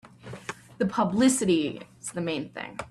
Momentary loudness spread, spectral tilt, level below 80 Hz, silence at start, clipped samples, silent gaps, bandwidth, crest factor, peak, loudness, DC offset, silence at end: 17 LU; -4.5 dB/octave; -62 dBFS; 0.05 s; under 0.1%; none; 13.5 kHz; 18 dB; -10 dBFS; -26 LUFS; under 0.1%; 0 s